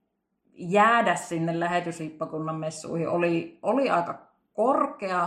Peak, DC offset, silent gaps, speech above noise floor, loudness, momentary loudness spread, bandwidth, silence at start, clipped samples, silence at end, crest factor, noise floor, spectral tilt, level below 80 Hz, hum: -8 dBFS; under 0.1%; none; 48 dB; -26 LUFS; 14 LU; 13.5 kHz; 0.6 s; under 0.1%; 0 s; 20 dB; -73 dBFS; -5.5 dB/octave; -72 dBFS; none